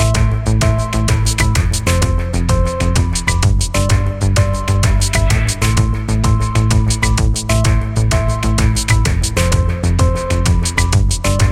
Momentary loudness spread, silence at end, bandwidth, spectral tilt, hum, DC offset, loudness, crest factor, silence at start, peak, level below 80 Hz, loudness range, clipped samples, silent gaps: 2 LU; 0 s; 15.5 kHz; -5 dB/octave; none; under 0.1%; -15 LUFS; 12 dB; 0 s; 0 dBFS; -18 dBFS; 1 LU; under 0.1%; none